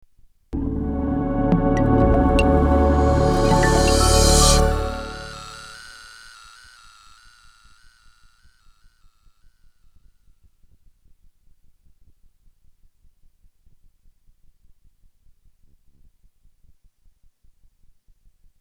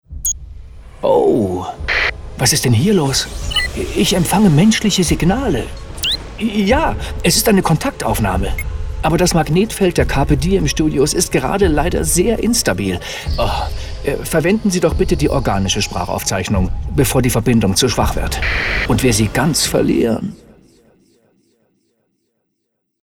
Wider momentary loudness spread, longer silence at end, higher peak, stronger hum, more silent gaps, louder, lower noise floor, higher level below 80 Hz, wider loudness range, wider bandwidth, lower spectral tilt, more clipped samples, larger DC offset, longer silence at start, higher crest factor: first, 24 LU vs 8 LU; first, 12.7 s vs 2.65 s; about the same, -2 dBFS vs 0 dBFS; neither; neither; about the same, -18 LUFS vs -16 LUFS; second, -55 dBFS vs -72 dBFS; about the same, -28 dBFS vs -26 dBFS; first, 22 LU vs 3 LU; second, 16 kHz vs over 20 kHz; about the same, -5 dB/octave vs -4.5 dB/octave; neither; second, under 0.1% vs 0.3%; first, 0.5 s vs 0.1 s; about the same, 20 dB vs 16 dB